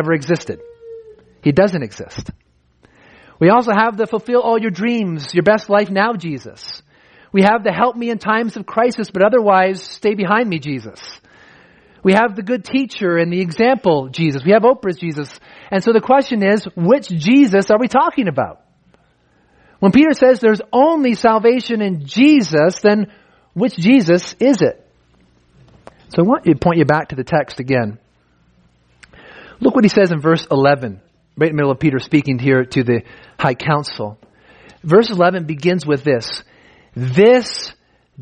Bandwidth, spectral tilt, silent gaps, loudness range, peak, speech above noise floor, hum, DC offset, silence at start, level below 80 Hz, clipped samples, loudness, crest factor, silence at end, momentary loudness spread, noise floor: 9.8 kHz; -6.5 dB/octave; none; 4 LU; 0 dBFS; 42 dB; none; under 0.1%; 0 s; -52 dBFS; under 0.1%; -15 LUFS; 16 dB; 0 s; 14 LU; -56 dBFS